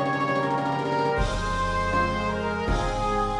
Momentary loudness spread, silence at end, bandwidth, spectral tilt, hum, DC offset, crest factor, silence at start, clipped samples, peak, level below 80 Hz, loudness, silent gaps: 2 LU; 0 s; 11.5 kHz; -5.5 dB/octave; none; under 0.1%; 14 dB; 0 s; under 0.1%; -12 dBFS; -34 dBFS; -25 LUFS; none